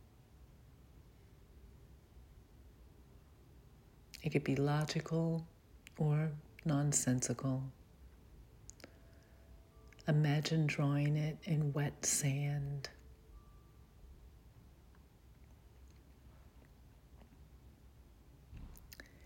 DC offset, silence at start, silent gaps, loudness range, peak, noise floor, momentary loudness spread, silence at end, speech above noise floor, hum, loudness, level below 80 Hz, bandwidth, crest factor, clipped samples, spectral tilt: under 0.1%; 0.4 s; none; 9 LU; -20 dBFS; -62 dBFS; 23 LU; 0 s; 27 dB; none; -36 LUFS; -62 dBFS; 16.5 kHz; 22 dB; under 0.1%; -5 dB/octave